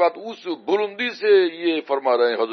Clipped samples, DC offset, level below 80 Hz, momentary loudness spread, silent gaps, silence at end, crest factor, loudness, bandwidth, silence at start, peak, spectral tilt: under 0.1%; under 0.1%; -86 dBFS; 12 LU; none; 0 s; 14 dB; -21 LUFS; 6.4 kHz; 0 s; -6 dBFS; -5 dB/octave